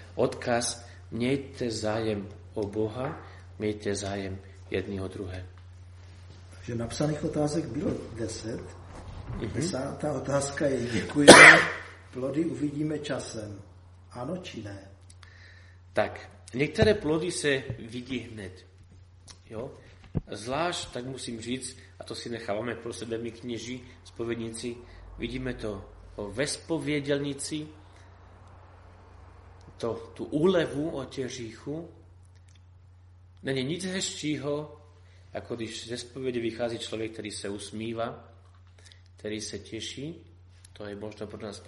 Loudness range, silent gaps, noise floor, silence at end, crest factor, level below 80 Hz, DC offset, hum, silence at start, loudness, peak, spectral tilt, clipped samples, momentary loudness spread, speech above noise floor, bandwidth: 19 LU; none; -53 dBFS; 0 s; 30 dB; -54 dBFS; under 0.1%; none; 0 s; -26 LUFS; 0 dBFS; -3.5 dB/octave; under 0.1%; 14 LU; 26 dB; 11.5 kHz